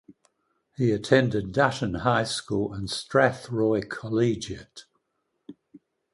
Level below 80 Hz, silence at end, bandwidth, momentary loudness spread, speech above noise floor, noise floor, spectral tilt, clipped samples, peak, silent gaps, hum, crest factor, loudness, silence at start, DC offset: -54 dBFS; 0.35 s; 11.5 kHz; 8 LU; 52 dB; -77 dBFS; -5.5 dB/octave; under 0.1%; -4 dBFS; none; none; 22 dB; -25 LUFS; 0.8 s; under 0.1%